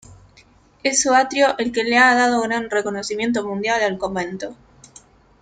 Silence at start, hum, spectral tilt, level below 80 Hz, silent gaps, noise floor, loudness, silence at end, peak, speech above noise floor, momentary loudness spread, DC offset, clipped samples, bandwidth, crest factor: 0.1 s; none; -2.5 dB/octave; -56 dBFS; none; -52 dBFS; -18 LUFS; 0.9 s; -2 dBFS; 33 dB; 11 LU; under 0.1%; under 0.1%; 9.6 kHz; 18 dB